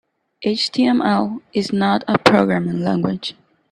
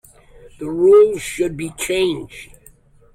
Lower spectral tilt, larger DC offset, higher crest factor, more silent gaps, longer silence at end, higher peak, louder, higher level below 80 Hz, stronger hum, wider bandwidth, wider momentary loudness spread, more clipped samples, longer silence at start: first, -6 dB/octave vs -4.5 dB/octave; neither; about the same, 18 dB vs 14 dB; neither; second, 0.4 s vs 0.7 s; first, 0 dBFS vs -4 dBFS; about the same, -18 LUFS vs -17 LUFS; second, -56 dBFS vs -48 dBFS; neither; second, 11 kHz vs 15.5 kHz; second, 9 LU vs 21 LU; neither; second, 0.4 s vs 0.6 s